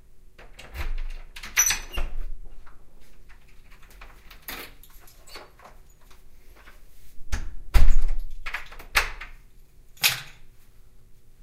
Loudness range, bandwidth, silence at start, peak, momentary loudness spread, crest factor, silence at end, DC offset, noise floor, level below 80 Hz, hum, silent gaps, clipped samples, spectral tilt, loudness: 17 LU; 15.5 kHz; 0.15 s; -2 dBFS; 26 LU; 22 dB; 0.3 s; under 0.1%; -49 dBFS; -28 dBFS; none; none; under 0.1%; -1 dB/octave; -27 LUFS